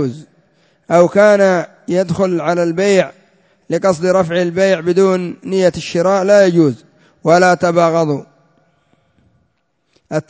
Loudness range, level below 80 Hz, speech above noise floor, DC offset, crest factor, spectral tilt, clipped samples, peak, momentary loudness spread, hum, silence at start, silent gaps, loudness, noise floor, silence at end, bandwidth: 3 LU; -54 dBFS; 52 dB; under 0.1%; 14 dB; -6 dB/octave; under 0.1%; 0 dBFS; 10 LU; none; 0 s; none; -14 LUFS; -64 dBFS; 0.1 s; 8 kHz